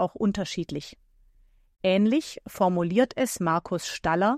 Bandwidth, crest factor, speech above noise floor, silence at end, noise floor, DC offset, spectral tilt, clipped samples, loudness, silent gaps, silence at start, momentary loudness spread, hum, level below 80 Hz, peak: 15.5 kHz; 18 dB; 34 dB; 0 s; -60 dBFS; under 0.1%; -5.5 dB/octave; under 0.1%; -26 LUFS; none; 0 s; 11 LU; none; -56 dBFS; -8 dBFS